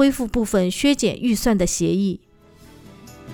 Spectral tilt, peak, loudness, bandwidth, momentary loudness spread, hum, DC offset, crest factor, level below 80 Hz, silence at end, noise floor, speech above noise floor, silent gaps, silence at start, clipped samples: -5 dB/octave; -4 dBFS; -20 LUFS; over 20 kHz; 5 LU; none; under 0.1%; 16 dB; -38 dBFS; 0 s; -48 dBFS; 29 dB; none; 0 s; under 0.1%